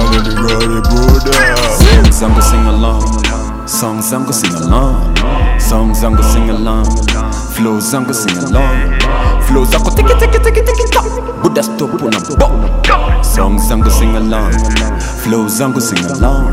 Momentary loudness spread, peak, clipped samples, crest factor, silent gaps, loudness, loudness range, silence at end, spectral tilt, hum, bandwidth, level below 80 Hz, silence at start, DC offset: 6 LU; 0 dBFS; 1%; 10 dB; none; -12 LUFS; 3 LU; 0 s; -4.5 dB/octave; none; 16 kHz; -12 dBFS; 0 s; under 0.1%